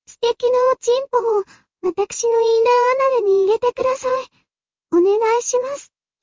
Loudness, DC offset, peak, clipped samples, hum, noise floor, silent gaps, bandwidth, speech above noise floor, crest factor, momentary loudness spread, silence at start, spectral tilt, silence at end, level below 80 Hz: -18 LUFS; under 0.1%; -4 dBFS; under 0.1%; none; -77 dBFS; none; 7.6 kHz; 60 dB; 14 dB; 10 LU; 0.1 s; -2.5 dB/octave; 0.4 s; -62 dBFS